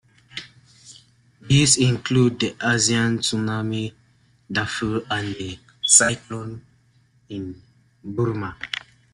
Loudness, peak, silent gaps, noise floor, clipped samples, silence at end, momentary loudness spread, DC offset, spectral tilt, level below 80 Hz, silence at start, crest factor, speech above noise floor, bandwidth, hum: -20 LUFS; 0 dBFS; none; -59 dBFS; under 0.1%; 0.35 s; 22 LU; under 0.1%; -3.5 dB/octave; -52 dBFS; 0.35 s; 24 dB; 38 dB; 12.5 kHz; none